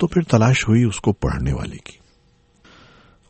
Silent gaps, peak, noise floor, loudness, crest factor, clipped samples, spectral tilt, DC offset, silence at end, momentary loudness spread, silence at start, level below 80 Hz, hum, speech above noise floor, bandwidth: none; -2 dBFS; -57 dBFS; -18 LUFS; 18 dB; under 0.1%; -6.5 dB/octave; under 0.1%; 1.5 s; 13 LU; 0 s; -36 dBFS; none; 39 dB; 8.8 kHz